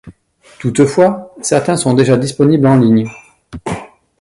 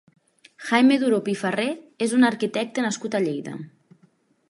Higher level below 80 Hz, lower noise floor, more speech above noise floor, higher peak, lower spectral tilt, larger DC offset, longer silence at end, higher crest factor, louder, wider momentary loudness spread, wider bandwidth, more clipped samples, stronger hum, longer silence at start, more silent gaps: first, -46 dBFS vs -76 dBFS; second, -46 dBFS vs -62 dBFS; second, 35 dB vs 39 dB; first, 0 dBFS vs -4 dBFS; first, -6 dB/octave vs -4.5 dB/octave; neither; second, 0.35 s vs 0.8 s; second, 14 dB vs 20 dB; first, -12 LUFS vs -22 LUFS; second, 14 LU vs 17 LU; about the same, 11.5 kHz vs 11.5 kHz; neither; neither; second, 0.05 s vs 0.6 s; neither